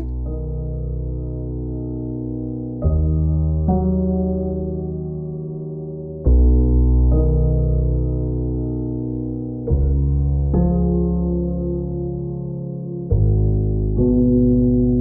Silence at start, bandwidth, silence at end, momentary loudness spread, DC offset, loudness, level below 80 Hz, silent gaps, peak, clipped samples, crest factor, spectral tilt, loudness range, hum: 0 s; 1.3 kHz; 0 s; 11 LU; under 0.1%; -20 LUFS; -22 dBFS; none; -6 dBFS; under 0.1%; 12 dB; -17.5 dB/octave; 3 LU; none